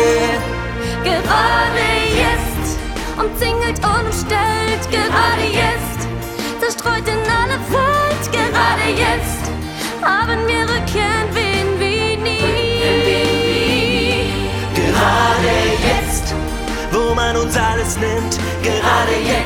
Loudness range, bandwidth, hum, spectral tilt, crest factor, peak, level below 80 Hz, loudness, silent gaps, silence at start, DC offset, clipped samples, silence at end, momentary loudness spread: 2 LU; 19 kHz; none; -4 dB/octave; 16 dB; -2 dBFS; -28 dBFS; -16 LUFS; none; 0 s; under 0.1%; under 0.1%; 0 s; 7 LU